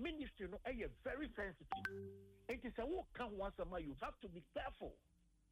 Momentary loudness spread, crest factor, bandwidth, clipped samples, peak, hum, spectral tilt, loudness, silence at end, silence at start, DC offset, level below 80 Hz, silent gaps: 8 LU; 20 dB; 13 kHz; under 0.1%; -30 dBFS; none; -6.5 dB/octave; -49 LUFS; 0.55 s; 0 s; under 0.1%; -60 dBFS; none